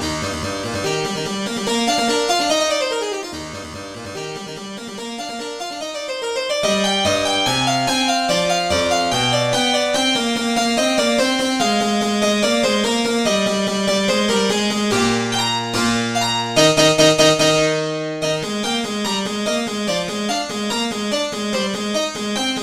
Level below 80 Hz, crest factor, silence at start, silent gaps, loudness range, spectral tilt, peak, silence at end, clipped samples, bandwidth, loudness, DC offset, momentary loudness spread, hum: -48 dBFS; 18 dB; 0 s; none; 6 LU; -3 dB/octave; 0 dBFS; 0 s; under 0.1%; 16 kHz; -18 LUFS; under 0.1%; 12 LU; none